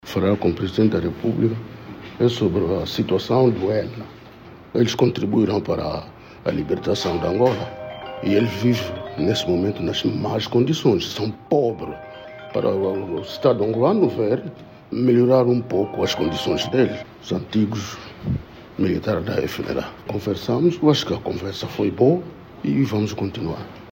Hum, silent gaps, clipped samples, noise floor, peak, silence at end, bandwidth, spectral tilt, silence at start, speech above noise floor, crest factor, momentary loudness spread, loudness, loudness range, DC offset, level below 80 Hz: none; none; under 0.1%; -42 dBFS; -2 dBFS; 0 s; 16.5 kHz; -6.5 dB/octave; 0.05 s; 22 dB; 18 dB; 13 LU; -21 LUFS; 4 LU; under 0.1%; -48 dBFS